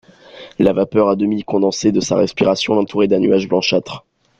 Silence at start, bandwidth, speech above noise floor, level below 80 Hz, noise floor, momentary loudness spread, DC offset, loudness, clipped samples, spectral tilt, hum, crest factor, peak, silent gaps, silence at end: 0.35 s; 8.6 kHz; 24 dB; -50 dBFS; -39 dBFS; 4 LU; under 0.1%; -16 LUFS; under 0.1%; -5.5 dB/octave; none; 16 dB; -2 dBFS; none; 0.4 s